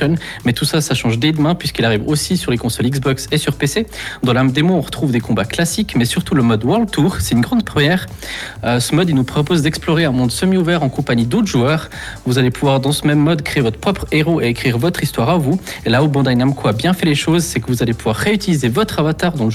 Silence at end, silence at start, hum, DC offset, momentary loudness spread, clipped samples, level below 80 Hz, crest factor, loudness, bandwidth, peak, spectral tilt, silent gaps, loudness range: 0 s; 0 s; none; under 0.1%; 4 LU; under 0.1%; -38 dBFS; 12 dB; -16 LUFS; 15.5 kHz; -4 dBFS; -5.5 dB/octave; none; 1 LU